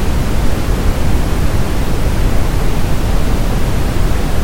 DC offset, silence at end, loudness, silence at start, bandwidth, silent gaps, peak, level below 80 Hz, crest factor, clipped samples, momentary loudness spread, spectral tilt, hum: under 0.1%; 0 s; -17 LUFS; 0 s; 17 kHz; none; 0 dBFS; -14 dBFS; 10 dB; under 0.1%; 1 LU; -6 dB/octave; none